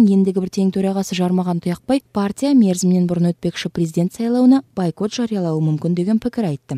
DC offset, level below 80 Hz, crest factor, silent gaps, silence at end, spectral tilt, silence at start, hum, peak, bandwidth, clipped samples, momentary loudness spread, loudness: under 0.1%; -54 dBFS; 14 dB; none; 0 s; -7 dB/octave; 0 s; none; -4 dBFS; 13.5 kHz; under 0.1%; 8 LU; -18 LUFS